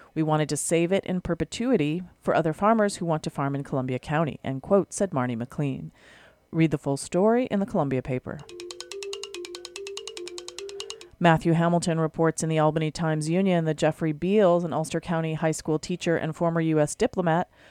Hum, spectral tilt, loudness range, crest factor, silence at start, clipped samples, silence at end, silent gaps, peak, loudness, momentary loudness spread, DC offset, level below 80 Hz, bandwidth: none; -6 dB/octave; 4 LU; 20 dB; 0.15 s; under 0.1%; 0.25 s; none; -6 dBFS; -25 LUFS; 15 LU; under 0.1%; -54 dBFS; 13 kHz